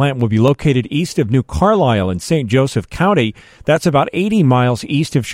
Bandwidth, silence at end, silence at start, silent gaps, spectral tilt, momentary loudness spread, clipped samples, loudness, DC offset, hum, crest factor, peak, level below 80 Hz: 14.5 kHz; 0 s; 0 s; none; -6.5 dB/octave; 5 LU; under 0.1%; -15 LUFS; under 0.1%; none; 14 dB; -2 dBFS; -38 dBFS